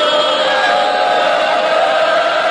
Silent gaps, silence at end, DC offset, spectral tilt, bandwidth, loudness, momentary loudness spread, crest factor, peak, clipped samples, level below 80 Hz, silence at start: none; 0 s; under 0.1%; -1.5 dB/octave; 10.5 kHz; -13 LUFS; 1 LU; 10 dB; -2 dBFS; under 0.1%; -58 dBFS; 0 s